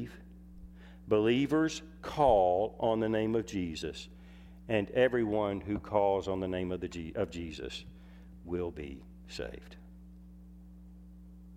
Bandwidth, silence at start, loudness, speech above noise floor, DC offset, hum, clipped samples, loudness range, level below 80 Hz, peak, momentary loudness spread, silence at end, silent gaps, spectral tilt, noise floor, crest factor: 14 kHz; 0 s; -32 LUFS; 20 dB; under 0.1%; none; under 0.1%; 13 LU; -52 dBFS; -14 dBFS; 25 LU; 0 s; none; -6 dB/octave; -52 dBFS; 20 dB